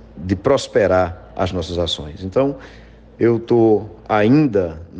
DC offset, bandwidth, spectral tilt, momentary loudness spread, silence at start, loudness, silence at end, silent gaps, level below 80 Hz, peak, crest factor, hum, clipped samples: under 0.1%; 9.4 kHz; -6.5 dB/octave; 9 LU; 0.15 s; -18 LUFS; 0 s; none; -42 dBFS; -4 dBFS; 14 dB; none; under 0.1%